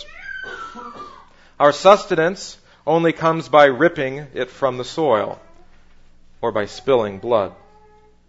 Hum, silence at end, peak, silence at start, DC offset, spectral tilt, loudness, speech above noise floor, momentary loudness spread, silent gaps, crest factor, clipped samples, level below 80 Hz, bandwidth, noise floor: none; 0.75 s; 0 dBFS; 0 s; under 0.1%; -5 dB/octave; -18 LUFS; 33 dB; 20 LU; none; 20 dB; under 0.1%; -50 dBFS; 8 kHz; -50 dBFS